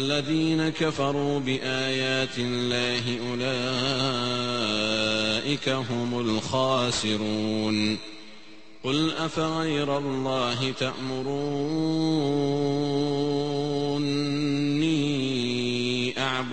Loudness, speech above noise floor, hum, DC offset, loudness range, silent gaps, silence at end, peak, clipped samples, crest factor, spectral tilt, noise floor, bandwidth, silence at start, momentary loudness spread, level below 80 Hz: -26 LUFS; 24 dB; none; 0.6%; 2 LU; none; 0 s; -10 dBFS; under 0.1%; 16 dB; -5 dB/octave; -50 dBFS; 8.8 kHz; 0 s; 4 LU; -58 dBFS